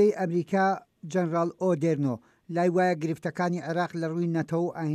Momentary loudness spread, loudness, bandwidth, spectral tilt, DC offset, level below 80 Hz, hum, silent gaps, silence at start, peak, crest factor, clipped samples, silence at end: 7 LU; -28 LUFS; 10.5 kHz; -7.5 dB/octave; under 0.1%; -74 dBFS; none; none; 0 s; -12 dBFS; 14 dB; under 0.1%; 0 s